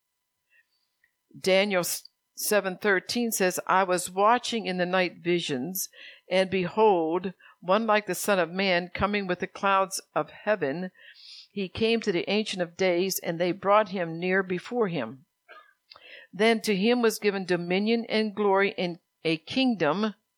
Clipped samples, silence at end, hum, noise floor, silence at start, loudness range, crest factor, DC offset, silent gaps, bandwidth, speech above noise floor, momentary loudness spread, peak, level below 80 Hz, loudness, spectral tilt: under 0.1%; 0.25 s; none; -80 dBFS; 1.35 s; 3 LU; 20 dB; under 0.1%; none; 20 kHz; 54 dB; 10 LU; -8 dBFS; -62 dBFS; -26 LUFS; -4 dB/octave